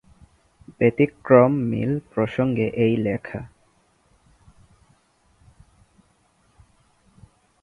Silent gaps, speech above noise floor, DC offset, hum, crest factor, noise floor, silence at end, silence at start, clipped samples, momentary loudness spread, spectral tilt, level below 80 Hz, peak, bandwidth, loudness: none; 42 dB; under 0.1%; none; 24 dB; -62 dBFS; 4.15 s; 0.7 s; under 0.1%; 15 LU; -9.5 dB/octave; -56 dBFS; -2 dBFS; 10.5 kHz; -21 LUFS